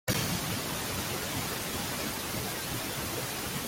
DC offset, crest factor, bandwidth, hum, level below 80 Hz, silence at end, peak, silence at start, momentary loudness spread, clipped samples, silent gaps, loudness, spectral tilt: under 0.1%; 18 dB; 17 kHz; none; -52 dBFS; 0 s; -16 dBFS; 0.05 s; 3 LU; under 0.1%; none; -32 LUFS; -3 dB/octave